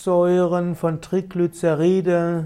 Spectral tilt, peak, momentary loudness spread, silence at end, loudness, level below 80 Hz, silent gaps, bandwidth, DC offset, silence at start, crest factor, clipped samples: -8 dB/octave; -8 dBFS; 7 LU; 0 s; -20 LUFS; -56 dBFS; none; 12.5 kHz; under 0.1%; 0 s; 12 dB; under 0.1%